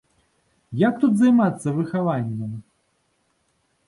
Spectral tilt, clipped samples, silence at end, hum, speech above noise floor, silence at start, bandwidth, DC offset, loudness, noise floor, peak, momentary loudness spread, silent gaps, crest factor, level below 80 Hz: -8 dB/octave; under 0.1%; 1.25 s; none; 48 dB; 0.7 s; 11.5 kHz; under 0.1%; -21 LUFS; -68 dBFS; -6 dBFS; 17 LU; none; 16 dB; -64 dBFS